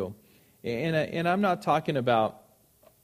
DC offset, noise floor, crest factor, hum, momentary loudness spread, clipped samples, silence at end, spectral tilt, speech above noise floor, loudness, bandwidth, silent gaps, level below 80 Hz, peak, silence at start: under 0.1%; -61 dBFS; 18 dB; none; 10 LU; under 0.1%; 0.65 s; -6.5 dB/octave; 35 dB; -27 LUFS; 15.5 kHz; none; -66 dBFS; -10 dBFS; 0 s